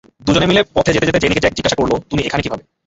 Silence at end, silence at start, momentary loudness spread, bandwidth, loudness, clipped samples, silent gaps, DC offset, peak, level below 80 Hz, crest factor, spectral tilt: 0.3 s; 0.25 s; 6 LU; 8 kHz; -15 LUFS; under 0.1%; none; under 0.1%; 0 dBFS; -36 dBFS; 16 dB; -5 dB/octave